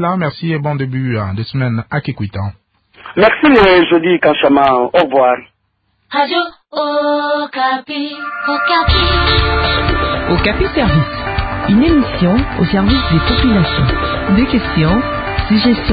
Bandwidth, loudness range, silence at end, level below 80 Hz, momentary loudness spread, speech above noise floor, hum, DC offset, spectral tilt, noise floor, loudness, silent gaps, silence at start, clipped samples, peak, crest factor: 5 kHz; 5 LU; 0 s; -24 dBFS; 10 LU; 51 dB; none; under 0.1%; -9 dB/octave; -63 dBFS; -13 LUFS; none; 0 s; under 0.1%; 0 dBFS; 14 dB